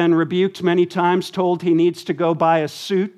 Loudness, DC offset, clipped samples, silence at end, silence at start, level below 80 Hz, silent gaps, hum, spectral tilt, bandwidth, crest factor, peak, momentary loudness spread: -19 LUFS; under 0.1%; under 0.1%; 0.1 s; 0 s; -70 dBFS; none; none; -6.5 dB/octave; 13 kHz; 14 dB; -4 dBFS; 4 LU